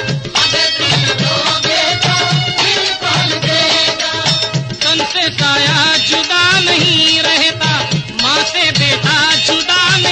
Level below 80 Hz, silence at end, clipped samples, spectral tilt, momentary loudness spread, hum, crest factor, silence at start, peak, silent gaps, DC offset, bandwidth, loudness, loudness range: -46 dBFS; 0 s; under 0.1%; -2.5 dB/octave; 4 LU; none; 12 dB; 0 s; 0 dBFS; none; under 0.1%; 9.4 kHz; -11 LUFS; 2 LU